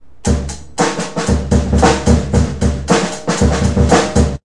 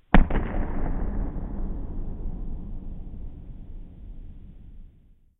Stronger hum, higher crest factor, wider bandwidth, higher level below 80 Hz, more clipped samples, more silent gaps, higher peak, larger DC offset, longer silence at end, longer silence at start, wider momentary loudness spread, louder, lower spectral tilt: neither; second, 14 dB vs 26 dB; first, 11.5 kHz vs 3.9 kHz; first, -22 dBFS vs -28 dBFS; neither; neither; about the same, 0 dBFS vs 0 dBFS; first, 2% vs under 0.1%; second, 0 s vs 0.5 s; first, 0.25 s vs 0.1 s; second, 6 LU vs 19 LU; first, -15 LUFS vs -32 LUFS; second, -5.5 dB/octave vs -10.5 dB/octave